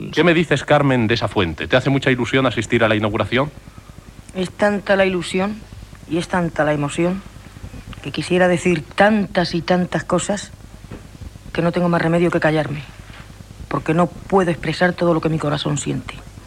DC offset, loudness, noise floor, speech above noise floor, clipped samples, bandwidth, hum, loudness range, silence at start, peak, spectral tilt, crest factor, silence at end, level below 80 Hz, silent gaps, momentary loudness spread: under 0.1%; -18 LUFS; -40 dBFS; 22 dB; under 0.1%; 12.5 kHz; none; 4 LU; 0 s; -2 dBFS; -5.5 dB/octave; 18 dB; 0 s; -42 dBFS; none; 21 LU